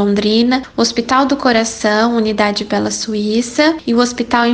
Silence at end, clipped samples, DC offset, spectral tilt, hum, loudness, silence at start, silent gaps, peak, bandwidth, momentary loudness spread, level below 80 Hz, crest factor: 0 s; under 0.1%; under 0.1%; -4 dB/octave; none; -14 LUFS; 0 s; none; 0 dBFS; 9.8 kHz; 4 LU; -46 dBFS; 14 dB